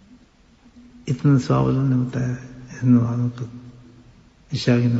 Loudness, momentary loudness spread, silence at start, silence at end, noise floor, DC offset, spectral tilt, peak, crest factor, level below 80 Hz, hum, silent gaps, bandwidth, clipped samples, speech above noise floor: -21 LUFS; 17 LU; 1.05 s; 0 s; -53 dBFS; under 0.1%; -8 dB/octave; -6 dBFS; 16 dB; -50 dBFS; none; none; 8 kHz; under 0.1%; 34 dB